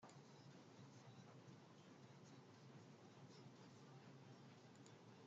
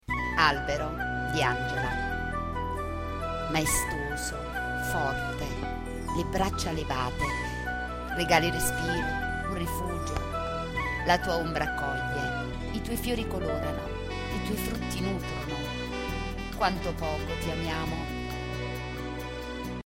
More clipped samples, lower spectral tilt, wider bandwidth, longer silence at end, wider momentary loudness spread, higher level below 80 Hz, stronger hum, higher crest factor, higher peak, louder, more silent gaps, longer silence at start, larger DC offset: neither; about the same, -5.5 dB/octave vs -4.5 dB/octave; second, 7.6 kHz vs 16.5 kHz; about the same, 0 s vs 0.05 s; second, 1 LU vs 8 LU; second, under -90 dBFS vs -40 dBFS; neither; second, 14 dB vs 24 dB; second, -50 dBFS vs -8 dBFS; second, -64 LUFS vs -30 LUFS; neither; about the same, 0 s vs 0.05 s; neither